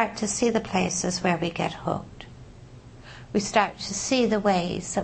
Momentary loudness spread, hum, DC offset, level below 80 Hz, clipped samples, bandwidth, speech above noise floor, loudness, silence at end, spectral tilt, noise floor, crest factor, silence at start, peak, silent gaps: 19 LU; none; under 0.1%; -50 dBFS; under 0.1%; 8.8 kHz; 21 dB; -25 LUFS; 0 s; -4 dB/octave; -46 dBFS; 18 dB; 0 s; -8 dBFS; none